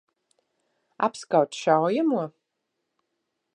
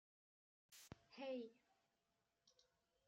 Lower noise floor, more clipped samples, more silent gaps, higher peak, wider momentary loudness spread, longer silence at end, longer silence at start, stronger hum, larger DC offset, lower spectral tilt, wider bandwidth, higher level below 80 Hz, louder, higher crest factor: second, -80 dBFS vs -89 dBFS; neither; neither; first, -6 dBFS vs -40 dBFS; second, 7 LU vs 14 LU; first, 1.25 s vs 0.45 s; first, 1 s vs 0.7 s; neither; neither; about the same, -5.5 dB/octave vs -4.5 dB/octave; second, 10.5 kHz vs 16 kHz; about the same, -84 dBFS vs -88 dBFS; first, -24 LUFS vs -55 LUFS; about the same, 22 dB vs 20 dB